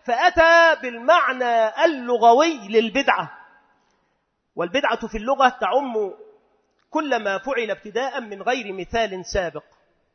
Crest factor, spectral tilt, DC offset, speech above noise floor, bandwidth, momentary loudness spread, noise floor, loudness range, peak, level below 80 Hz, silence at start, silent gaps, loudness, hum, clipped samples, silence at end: 20 dB; -3.5 dB/octave; under 0.1%; 51 dB; 6.6 kHz; 12 LU; -71 dBFS; 8 LU; -2 dBFS; -48 dBFS; 0.05 s; none; -20 LUFS; none; under 0.1%; 0.55 s